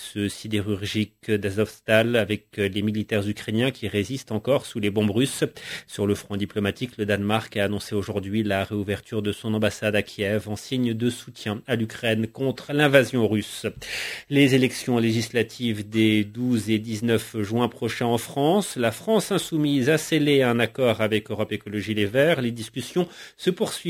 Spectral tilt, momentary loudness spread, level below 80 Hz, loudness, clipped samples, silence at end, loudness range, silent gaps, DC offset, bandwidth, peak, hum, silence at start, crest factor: -5.5 dB/octave; 8 LU; -52 dBFS; -24 LUFS; under 0.1%; 0 s; 4 LU; none; under 0.1%; 16 kHz; -2 dBFS; none; 0 s; 22 dB